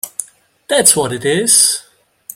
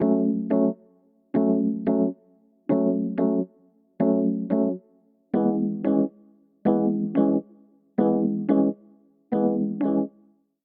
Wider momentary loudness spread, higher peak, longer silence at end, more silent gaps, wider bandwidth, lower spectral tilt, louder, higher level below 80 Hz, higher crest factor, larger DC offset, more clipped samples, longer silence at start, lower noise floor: first, 15 LU vs 7 LU; first, 0 dBFS vs -8 dBFS; about the same, 0.55 s vs 0.55 s; neither; first, over 20 kHz vs 3.6 kHz; second, -1.5 dB/octave vs -10.5 dB/octave; first, -11 LUFS vs -24 LUFS; first, -56 dBFS vs -68 dBFS; about the same, 16 dB vs 16 dB; neither; first, 0.2% vs under 0.1%; about the same, 0.05 s vs 0 s; second, -39 dBFS vs -61 dBFS